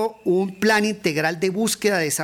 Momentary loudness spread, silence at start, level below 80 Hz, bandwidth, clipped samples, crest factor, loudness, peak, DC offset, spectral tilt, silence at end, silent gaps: 3 LU; 0 s; -62 dBFS; 17.5 kHz; under 0.1%; 12 dB; -21 LUFS; -8 dBFS; under 0.1%; -4 dB/octave; 0 s; none